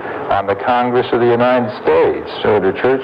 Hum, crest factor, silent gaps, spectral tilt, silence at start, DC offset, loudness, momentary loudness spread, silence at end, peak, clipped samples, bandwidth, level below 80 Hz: none; 12 dB; none; -8 dB/octave; 0 s; under 0.1%; -15 LUFS; 4 LU; 0 s; -2 dBFS; under 0.1%; 5.4 kHz; -48 dBFS